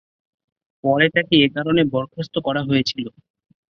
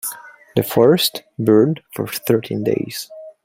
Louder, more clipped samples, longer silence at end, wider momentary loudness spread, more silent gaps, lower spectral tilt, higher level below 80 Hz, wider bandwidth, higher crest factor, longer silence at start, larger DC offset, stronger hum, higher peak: about the same, -19 LUFS vs -18 LUFS; neither; first, 0.6 s vs 0.15 s; second, 10 LU vs 14 LU; neither; about the same, -6 dB/octave vs -5.5 dB/octave; about the same, -56 dBFS vs -56 dBFS; second, 6.8 kHz vs 16.5 kHz; about the same, 18 dB vs 16 dB; first, 0.85 s vs 0.05 s; neither; neither; about the same, -2 dBFS vs -2 dBFS